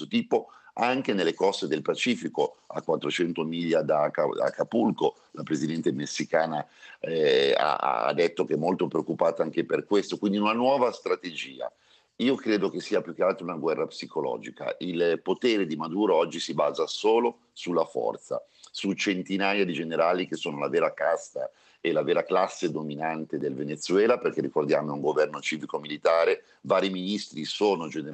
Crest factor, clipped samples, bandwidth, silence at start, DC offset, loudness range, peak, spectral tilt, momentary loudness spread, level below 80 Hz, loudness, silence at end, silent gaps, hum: 18 dB; under 0.1%; 8.8 kHz; 0 s; under 0.1%; 2 LU; -8 dBFS; -5 dB/octave; 9 LU; -80 dBFS; -27 LUFS; 0 s; none; none